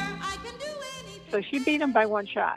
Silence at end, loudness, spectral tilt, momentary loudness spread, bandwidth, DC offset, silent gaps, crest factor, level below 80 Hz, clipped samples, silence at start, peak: 0 s; -28 LUFS; -4.5 dB/octave; 14 LU; 14 kHz; under 0.1%; none; 18 dB; -58 dBFS; under 0.1%; 0 s; -10 dBFS